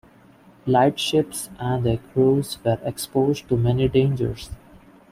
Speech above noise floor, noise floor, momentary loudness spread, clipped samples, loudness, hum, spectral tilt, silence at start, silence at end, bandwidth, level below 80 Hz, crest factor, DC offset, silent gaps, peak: 30 dB; -51 dBFS; 10 LU; under 0.1%; -22 LUFS; none; -6 dB/octave; 0.65 s; 0.35 s; 16 kHz; -46 dBFS; 18 dB; under 0.1%; none; -6 dBFS